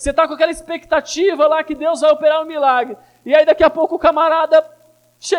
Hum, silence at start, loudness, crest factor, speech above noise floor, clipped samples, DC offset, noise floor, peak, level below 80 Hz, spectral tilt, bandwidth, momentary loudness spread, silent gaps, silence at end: none; 0 s; -15 LUFS; 14 dB; 25 dB; under 0.1%; under 0.1%; -40 dBFS; -2 dBFS; -44 dBFS; -3 dB/octave; 11.5 kHz; 7 LU; none; 0 s